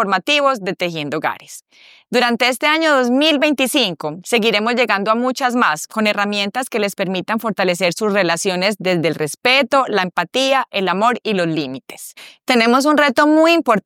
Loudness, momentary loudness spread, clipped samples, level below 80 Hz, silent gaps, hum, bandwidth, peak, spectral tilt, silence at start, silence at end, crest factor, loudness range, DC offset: -16 LUFS; 9 LU; under 0.1%; -70 dBFS; none; none; 17 kHz; -2 dBFS; -3.5 dB/octave; 0 s; 0.05 s; 16 dB; 2 LU; under 0.1%